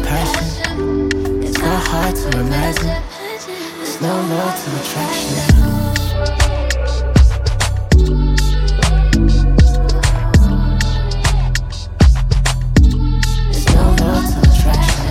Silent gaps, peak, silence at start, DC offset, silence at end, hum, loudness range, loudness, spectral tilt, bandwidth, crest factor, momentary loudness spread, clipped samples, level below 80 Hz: none; 0 dBFS; 0 s; under 0.1%; 0 s; none; 5 LU; -15 LUFS; -5.5 dB/octave; 16 kHz; 14 dB; 7 LU; under 0.1%; -16 dBFS